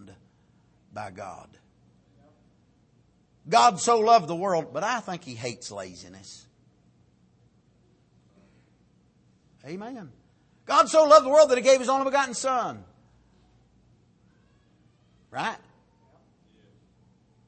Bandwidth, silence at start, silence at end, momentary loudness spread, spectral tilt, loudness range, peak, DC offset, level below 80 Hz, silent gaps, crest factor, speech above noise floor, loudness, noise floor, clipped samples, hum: 8.8 kHz; 0.95 s; 1.9 s; 25 LU; -3 dB/octave; 20 LU; -4 dBFS; under 0.1%; -70 dBFS; none; 24 dB; 40 dB; -22 LUFS; -63 dBFS; under 0.1%; none